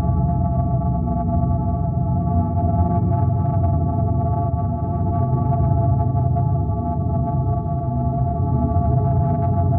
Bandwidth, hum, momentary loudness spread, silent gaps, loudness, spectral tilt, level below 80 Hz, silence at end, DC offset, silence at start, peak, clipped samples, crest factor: 2.2 kHz; none; 3 LU; none; -20 LUFS; -14 dB/octave; -28 dBFS; 0 s; under 0.1%; 0 s; -6 dBFS; under 0.1%; 12 dB